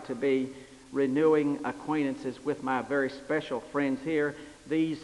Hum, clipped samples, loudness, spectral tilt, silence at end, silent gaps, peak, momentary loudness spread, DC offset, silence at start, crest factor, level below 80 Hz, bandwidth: none; under 0.1%; -30 LUFS; -6.5 dB/octave; 0 s; none; -14 dBFS; 9 LU; under 0.1%; 0 s; 16 dB; -64 dBFS; 11.5 kHz